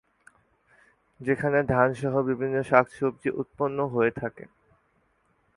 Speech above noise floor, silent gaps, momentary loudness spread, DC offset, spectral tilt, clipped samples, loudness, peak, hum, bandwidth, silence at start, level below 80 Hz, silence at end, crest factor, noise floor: 43 dB; none; 9 LU; under 0.1%; -8 dB/octave; under 0.1%; -26 LUFS; -2 dBFS; none; 11.5 kHz; 1.2 s; -58 dBFS; 1.1 s; 24 dB; -68 dBFS